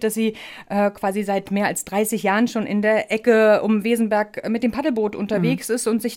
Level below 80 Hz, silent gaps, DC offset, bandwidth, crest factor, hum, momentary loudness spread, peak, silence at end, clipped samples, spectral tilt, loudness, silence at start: -58 dBFS; none; under 0.1%; 17 kHz; 16 dB; none; 8 LU; -4 dBFS; 0 s; under 0.1%; -5 dB/octave; -20 LUFS; 0 s